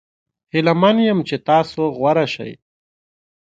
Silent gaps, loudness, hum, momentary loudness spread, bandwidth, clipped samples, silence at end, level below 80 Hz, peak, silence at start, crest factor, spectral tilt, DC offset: none; -17 LUFS; none; 9 LU; 7.8 kHz; under 0.1%; 0.9 s; -60 dBFS; 0 dBFS; 0.55 s; 18 dB; -7 dB/octave; under 0.1%